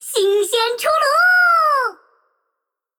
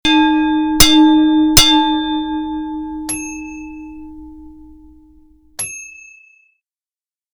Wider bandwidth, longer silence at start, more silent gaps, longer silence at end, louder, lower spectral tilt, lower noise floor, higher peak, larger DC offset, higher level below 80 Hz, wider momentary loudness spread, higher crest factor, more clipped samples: about the same, over 20 kHz vs over 20 kHz; about the same, 0 s vs 0.05 s; neither; second, 1.05 s vs 1.45 s; about the same, -15 LUFS vs -13 LUFS; second, 1 dB/octave vs -2.5 dB/octave; second, -79 dBFS vs under -90 dBFS; second, -4 dBFS vs 0 dBFS; neither; second, -70 dBFS vs -32 dBFS; second, 7 LU vs 24 LU; about the same, 12 dB vs 16 dB; neither